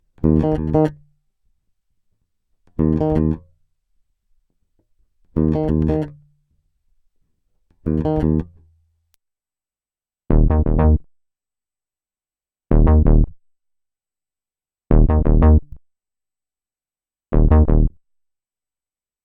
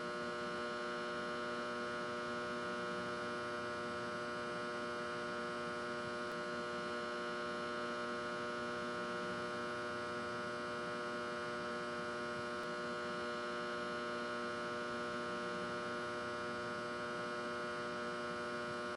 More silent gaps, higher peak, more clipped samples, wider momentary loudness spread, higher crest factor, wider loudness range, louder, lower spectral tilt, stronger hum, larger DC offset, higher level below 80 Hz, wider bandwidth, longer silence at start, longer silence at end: neither; first, 0 dBFS vs -30 dBFS; neither; first, 9 LU vs 1 LU; first, 20 dB vs 12 dB; first, 6 LU vs 0 LU; first, -18 LUFS vs -42 LUFS; first, -12 dB/octave vs -4 dB/octave; neither; neither; first, -22 dBFS vs -74 dBFS; second, 3.4 kHz vs 11.5 kHz; first, 0.25 s vs 0 s; first, 1.35 s vs 0 s